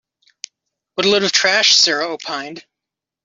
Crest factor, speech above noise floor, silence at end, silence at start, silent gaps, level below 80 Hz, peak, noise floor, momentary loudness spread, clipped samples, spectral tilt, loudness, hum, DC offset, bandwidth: 18 dB; 68 dB; 0.65 s; 0.95 s; none; -66 dBFS; -2 dBFS; -85 dBFS; 25 LU; under 0.1%; -1 dB/octave; -14 LUFS; none; under 0.1%; 8 kHz